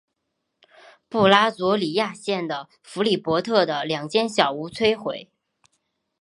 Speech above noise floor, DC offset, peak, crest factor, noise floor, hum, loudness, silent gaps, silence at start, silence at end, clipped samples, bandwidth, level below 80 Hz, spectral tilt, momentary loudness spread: 56 dB; under 0.1%; 0 dBFS; 24 dB; -78 dBFS; none; -22 LUFS; none; 1.1 s; 0.95 s; under 0.1%; 11.5 kHz; -62 dBFS; -4.5 dB/octave; 13 LU